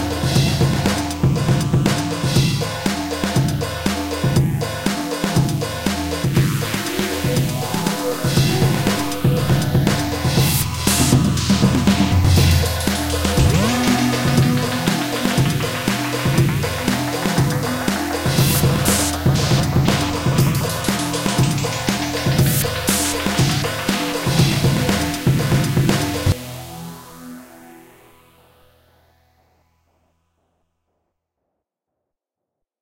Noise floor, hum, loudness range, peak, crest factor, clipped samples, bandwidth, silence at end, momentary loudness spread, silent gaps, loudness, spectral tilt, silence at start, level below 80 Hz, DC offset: -82 dBFS; none; 4 LU; -2 dBFS; 18 dB; under 0.1%; 17 kHz; 5.05 s; 6 LU; none; -18 LUFS; -5 dB/octave; 0 s; -34 dBFS; under 0.1%